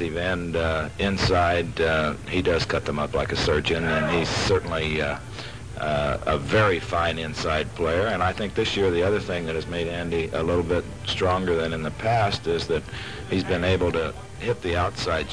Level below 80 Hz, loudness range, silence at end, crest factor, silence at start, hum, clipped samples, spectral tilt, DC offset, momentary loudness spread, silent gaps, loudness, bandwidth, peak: -40 dBFS; 2 LU; 0 s; 16 dB; 0 s; none; under 0.1%; -5.5 dB/octave; 0.5%; 6 LU; none; -24 LUFS; 10.5 kHz; -8 dBFS